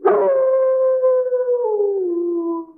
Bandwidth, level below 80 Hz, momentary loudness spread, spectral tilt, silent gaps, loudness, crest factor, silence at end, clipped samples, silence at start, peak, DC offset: 2.8 kHz; -74 dBFS; 5 LU; -11 dB/octave; none; -18 LUFS; 14 dB; 0.05 s; under 0.1%; 0 s; -4 dBFS; under 0.1%